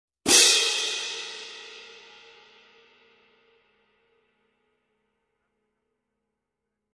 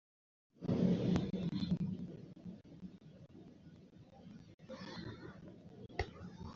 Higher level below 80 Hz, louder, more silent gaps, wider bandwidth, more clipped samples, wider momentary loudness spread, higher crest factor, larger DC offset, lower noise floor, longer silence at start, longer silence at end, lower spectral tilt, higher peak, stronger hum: second, -70 dBFS vs -60 dBFS; first, -19 LUFS vs -40 LUFS; second, none vs 4.54-4.58 s; first, 11 kHz vs 7.2 kHz; neither; first, 26 LU vs 23 LU; first, 28 dB vs 20 dB; neither; first, -83 dBFS vs -59 dBFS; second, 0.25 s vs 0.6 s; first, 5.1 s vs 0 s; second, 1 dB/octave vs -7.5 dB/octave; first, -2 dBFS vs -22 dBFS; neither